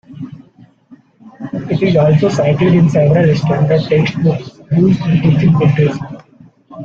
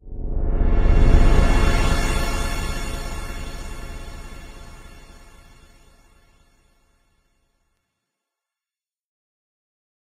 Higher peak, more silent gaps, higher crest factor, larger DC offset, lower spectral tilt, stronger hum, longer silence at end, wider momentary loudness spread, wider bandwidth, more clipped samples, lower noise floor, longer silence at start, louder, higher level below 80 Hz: about the same, -2 dBFS vs 0 dBFS; neither; second, 12 dB vs 20 dB; neither; first, -8.5 dB/octave vs -5.5 dB/octave; neither; second, 0 s vs 5 s; second, 15 LU vs 23 LU; second, 7.2 kHz vs 14.5 kHz; neither; second, -45 dBFS vs under -90 dBFS; about the same, 0.1 s vs 0.05 s; first, -12 LUFS vs -23 LUFS; second, -44 dBFS vs -22 dBFS